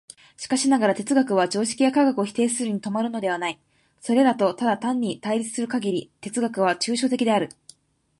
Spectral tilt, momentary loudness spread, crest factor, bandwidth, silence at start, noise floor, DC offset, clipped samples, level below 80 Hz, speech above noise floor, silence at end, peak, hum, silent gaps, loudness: -4 dB/octave; 8 LU; 16 dB; 11.5 kHz; 0.4 s; -54 dBFS; under 0.1%; under 0.1%; -70 dBFS; 31 dB; 0.75 s; -6 dBFS; none; none; -23 LUFS